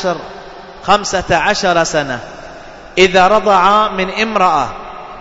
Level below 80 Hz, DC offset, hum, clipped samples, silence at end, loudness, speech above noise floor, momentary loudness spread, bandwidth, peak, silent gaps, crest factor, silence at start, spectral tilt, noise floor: -38 dBFS; under 0.1%; none; under 0.1%; 0 s; -12 LUFS; 21 dB; 22 LU; 8 kHz; 0 dBFS; none; 14 dB; 0 s; -3.5 dB/octave; -33 dBFS